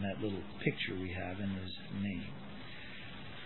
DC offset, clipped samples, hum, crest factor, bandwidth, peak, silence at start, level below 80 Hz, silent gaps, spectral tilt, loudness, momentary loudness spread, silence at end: 0.4%; under 0.1%; none; 24 dB; 4.3 kHz; -16 dBFS; 0 s; -62 dBFS; none; -4.5 dB/octave; -41 LUFS; 11 LU; 0 s